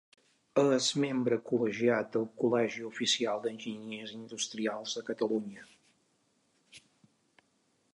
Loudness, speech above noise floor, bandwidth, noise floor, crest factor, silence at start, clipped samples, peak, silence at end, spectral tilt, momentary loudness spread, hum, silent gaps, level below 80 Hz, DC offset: -32 LUFS; 42 dB; 11 kHz; -74 dBFS; 20 dB; 0.55 s; under 0.1%; -14 dBFS; 1.15 s; -4 dB/octave; 13 LU; none; none; -82 dBFS; under 0.1%